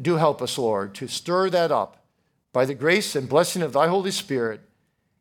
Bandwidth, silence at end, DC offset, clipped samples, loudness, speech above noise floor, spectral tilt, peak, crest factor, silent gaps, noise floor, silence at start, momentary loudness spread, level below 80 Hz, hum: 18.5 kHz; 0.65 s; under 0.1%; under 0.1%; -23 LUFS; 47 dB; -4.5 dB/octave; -4 dBFS; 20 dB; none; -70 dBFS; 0 s; 9 LU; -72 dBFS; none